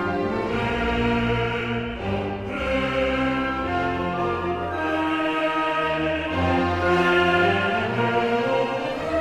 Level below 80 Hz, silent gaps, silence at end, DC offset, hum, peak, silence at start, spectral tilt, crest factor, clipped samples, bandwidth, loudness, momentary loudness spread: -40 dBFS; none; 0 s; under 0.1%; none; -6 dBFS; 0 s; -6.5 dB/octave; 16 dB; under 0.1%; 12 kHz; -23 LUFS; 7 LU